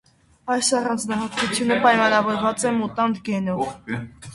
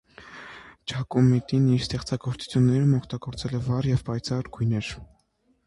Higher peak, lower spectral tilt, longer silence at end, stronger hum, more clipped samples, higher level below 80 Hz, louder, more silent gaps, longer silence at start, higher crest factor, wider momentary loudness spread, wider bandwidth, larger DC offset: first, -2 dBFS vs -10 dBFS; second, -3.5 dB/octave vs -7 dB/octave; second, 0 s vs 0.6 s; neither; neither; second, -56 dBFS vs -48 dBFS; first, -21 LUFS vs -25 LUFS; neither; first, 0.45 s vs 0.2 s; about the same, 20 dB vs 16 dB; second, 11 LU vs 21 LU; about the same, 11.5 kHz vs 11.5 kHz; neither